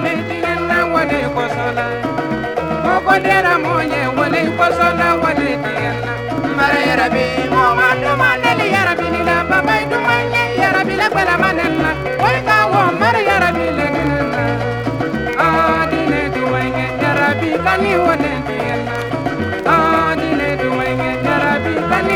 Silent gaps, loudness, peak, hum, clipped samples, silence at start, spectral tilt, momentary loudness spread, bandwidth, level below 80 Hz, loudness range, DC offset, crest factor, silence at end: none; -15 LUFS; 0 dBFS; none; under 0.1%; 0 s; -6 dB/octave; 7 LU; 19 kHz; -38 dBFS; 2 LU; under 0.1%; 16 dB; 0 s